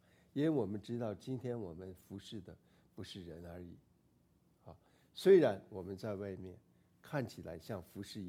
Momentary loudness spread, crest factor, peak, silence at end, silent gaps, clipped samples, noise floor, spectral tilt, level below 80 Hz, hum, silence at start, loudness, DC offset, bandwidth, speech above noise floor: 23 LU; 22 dB; -16 dBFS; 0 s; none; under 0.1%; -72 dBFS; -7 dB/octave; -72 dBFS; none; 0.35 s; -37 LUFS; under 0.1%; 15 kHz; 35 dB